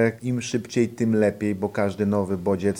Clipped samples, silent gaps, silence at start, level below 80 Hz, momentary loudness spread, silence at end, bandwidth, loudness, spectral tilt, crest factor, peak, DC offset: under 0.1%; none; 0 s; -60 dBFS; 5 LU; 0 s; 15.5 kHz; -24 LUFS; -6.5 dB/octave; 16 dB; -8 dBFS; under 0.1%